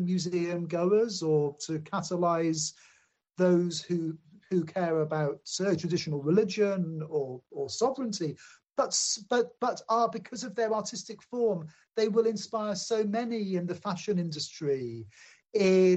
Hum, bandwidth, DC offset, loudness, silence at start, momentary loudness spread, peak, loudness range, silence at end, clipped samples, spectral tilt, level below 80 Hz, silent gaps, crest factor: none; 8.4 kHz; under 0.1%; -30 LUFS; 0 s; 10 LU; -12 dBFS; 1 LU; 0 s; under 0.1%; -5 dB/octave; -74 dBFS; none; 16 dB